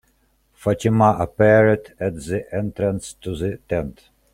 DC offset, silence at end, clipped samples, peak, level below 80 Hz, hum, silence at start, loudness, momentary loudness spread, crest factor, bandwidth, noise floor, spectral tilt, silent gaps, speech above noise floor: under 0.1%; 0.45 s; under 0.1%; -2 dBFS; -46 dBFS; none; 0.6 s; -20 LUFS; 12 LU; 18 dB; 13 kHz; -62 dBFS; -7 dB/octave; none; 43 dB